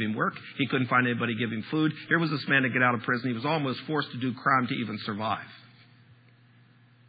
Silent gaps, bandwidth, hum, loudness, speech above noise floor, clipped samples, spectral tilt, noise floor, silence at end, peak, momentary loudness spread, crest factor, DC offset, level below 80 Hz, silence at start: none; 5 kHz; none; -27 LUFS; 30 dB; under 0.1%; -9.5 dB/octave; -58 dBFS; 1.5 s; -10 dBFS; 8 LU; 18 dB; under 0.1%; -78 dBFS; 0 s